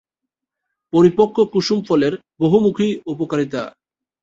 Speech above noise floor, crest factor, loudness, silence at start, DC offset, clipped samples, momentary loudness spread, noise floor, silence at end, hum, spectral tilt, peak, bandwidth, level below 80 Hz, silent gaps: 66 dB; 16 dB; -18 LUFS; 0.95 s; under 0.1%; under 0.1%; 10 LU; -83 dBFS; 0.55 s; none; -7 dB/octave; -2 dBFS; 7.8 kHz; -56 dBFS; none